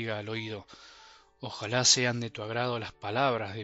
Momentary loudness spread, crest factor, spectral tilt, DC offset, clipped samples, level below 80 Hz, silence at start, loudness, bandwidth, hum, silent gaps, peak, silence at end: 18 LU; 24 dB; -2.5 dB/octave; under 0.1%; under 0.1%; -68 dBFS; 0 s; -28 LUFS; 8 kHz; none; none; -8 dBFS; 0 s